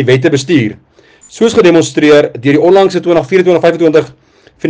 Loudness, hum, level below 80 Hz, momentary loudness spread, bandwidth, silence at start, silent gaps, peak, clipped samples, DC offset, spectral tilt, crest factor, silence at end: -9 LUFS; none; -50 dBFS; 5 LU; 9.8 kHz; 0 s; none; 0 dBFS; 0.8%; under 0.1%; -6 dB/octave; 10 dB; 0 s